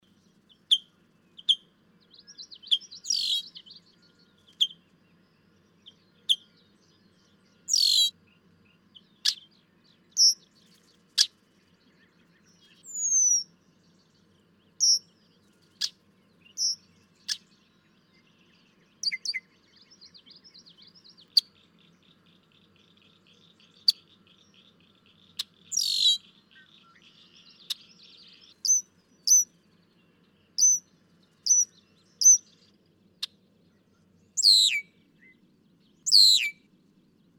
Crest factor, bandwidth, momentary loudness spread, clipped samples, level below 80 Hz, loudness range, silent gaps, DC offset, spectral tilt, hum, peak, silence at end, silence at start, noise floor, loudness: 26 dB; 18 kHz; 20 LU; under 0.1%; -86 dBFS; 11 LU; none; under 0.1%; 4 dB/octave; none; -4 dBFS; 0.85 s; 0.7 s; -64 dBFS; -23 LUFS